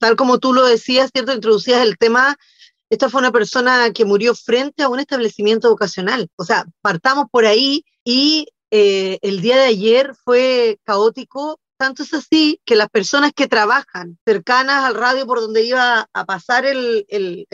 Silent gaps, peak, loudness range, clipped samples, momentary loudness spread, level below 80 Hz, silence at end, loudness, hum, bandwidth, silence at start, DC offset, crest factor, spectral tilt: 6.33-6.38 s, 8.00-8.06 s, 14.21-14.27 s; -4 dBFS; 2 LU; under 0.1%; 8 LU; -66 dBFS; 0.1 s; -15 LUFS; none; 7.8 kHz; 0 s; under 0.1%; 12 dB; -3.5 dB/octave